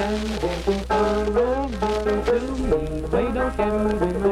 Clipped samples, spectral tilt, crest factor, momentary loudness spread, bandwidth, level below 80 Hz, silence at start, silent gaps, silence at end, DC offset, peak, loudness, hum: under 0.1%; -6.5 dB/octave; 14 dB; 3 LU; 14 kHz; -32 dBFS; 0 s; none; 0 s; under 0.1%; -8 dBFS; -23 LUFS; none